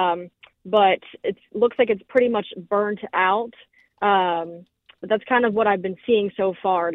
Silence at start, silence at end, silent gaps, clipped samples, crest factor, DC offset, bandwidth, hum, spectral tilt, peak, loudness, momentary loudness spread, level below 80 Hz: 0 s; 0 s; none; under 0.1%; 18 dB; under 0.1%; 4.1 kHz; none; -7.5 dB/octave; -4 dBFS; -22 LUFS; 11 LU; -64 dBFS